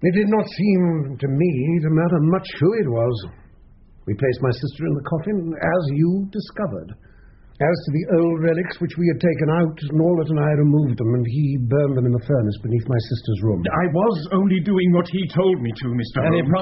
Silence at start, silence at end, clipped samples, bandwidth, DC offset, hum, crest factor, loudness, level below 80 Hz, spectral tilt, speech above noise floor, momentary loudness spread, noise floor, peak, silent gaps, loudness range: 0 s; 0 s; under 0.1%; 5.8 kHz; under 0.1%; none; 14 dB; -20 LUFS; -48 dBFS; -7.5 dB/octave; 28 dB; 7 LU; -47 dBFS; -4 dBFS; none; 4 LU